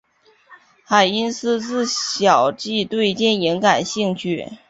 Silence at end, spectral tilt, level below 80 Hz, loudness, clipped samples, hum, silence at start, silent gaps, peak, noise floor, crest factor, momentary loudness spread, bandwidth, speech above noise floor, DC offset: 0.15 s; -3.5 dB/octave; -60 dBFS; -19 LUFS; under 0.1%; none; 0.5 s; none; -2 dBFS; -53 dBFS; 18 dB; 6 LU; 8 kHz; 34 dB; under 0.1%